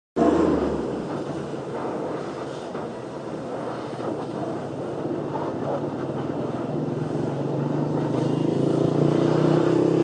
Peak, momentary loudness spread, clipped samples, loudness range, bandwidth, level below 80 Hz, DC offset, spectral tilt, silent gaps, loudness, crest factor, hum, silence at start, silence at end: -8 dBFS; 12 LU; under 0.1%; 8 LU; 9.8 kHz; -50 dBFS; under 0.1%; -8 dB/octave; none; -25 LUFS; 16 dB; none; 0.15 s; 0 s